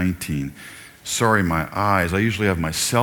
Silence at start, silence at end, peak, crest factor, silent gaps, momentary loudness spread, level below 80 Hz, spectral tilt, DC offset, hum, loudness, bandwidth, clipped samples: 0 s; 0 s; -2 dBFS; 18 dB; none; 15 LU; -42 dBFS; -4.5 dB/octave; under 0.1%; none; -21 LUFS; 19 kHz; under 0.1%